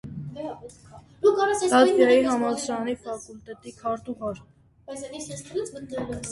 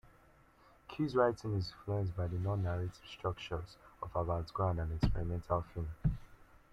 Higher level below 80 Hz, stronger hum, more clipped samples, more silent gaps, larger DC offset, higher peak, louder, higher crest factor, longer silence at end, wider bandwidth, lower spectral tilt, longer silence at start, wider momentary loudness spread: second, -56 dBFS vs -48 dBFS; neither; neither; neither; neither; first, -6 dBFS vs -16 dBFS; first, -24 LUFS vs -37 LUFS; about the same, 20 dB vs 22 dB; second, 0 s vs 0.3 s; first, 11.5 kHz vs 8.4 kHz; second, -4.5 dB/octave vs -8 dB/octave; second, 0.05 s vs 0.9 s; first, 22 LU vs 11 LU